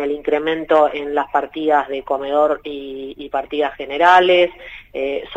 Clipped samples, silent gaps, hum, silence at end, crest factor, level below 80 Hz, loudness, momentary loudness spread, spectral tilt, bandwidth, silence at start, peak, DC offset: under 0.1%; none; none; 0 s; 18 dB; -50 dBFS; -17 LUFS; 17 LU; -5 dB/octave; 9 kHz; 0 s; 0 dBFS; under 0.1%